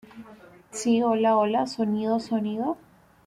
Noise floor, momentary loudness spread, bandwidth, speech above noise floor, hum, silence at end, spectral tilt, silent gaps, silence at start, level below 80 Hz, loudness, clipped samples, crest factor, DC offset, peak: -50 dBFS; 9 LU; 12 kHz; 26 dB; none; 0.5 s; -5.5 dB/octave; none; 0.15 s; -66 dBFS; -25 LUFS; under 0.1%; 14 dB; under 0.1%; -12 dBFS